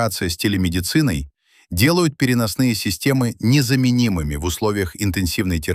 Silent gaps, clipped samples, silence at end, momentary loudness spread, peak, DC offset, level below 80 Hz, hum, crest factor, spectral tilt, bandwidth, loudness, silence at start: none; under 0.1%; 0 s; 6 LU; -2 dBFS; under 0.1%; -36 dBFS; none; 16 dB; -5 dB/octave; 16 kHz; -19 LUFS; 0 s